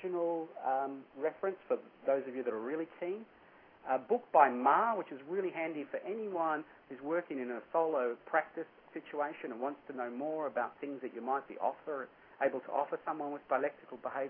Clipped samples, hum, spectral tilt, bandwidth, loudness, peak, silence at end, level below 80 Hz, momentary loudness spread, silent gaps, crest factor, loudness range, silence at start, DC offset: under 0.1%; none; -8.5 dB/octave; 3.6 kHz; -36 LUFS; -12 dBFS; 0 s; -86 dBFS; 12 LU; none; 24 dB; 6 LU; 0 s; under 0.1%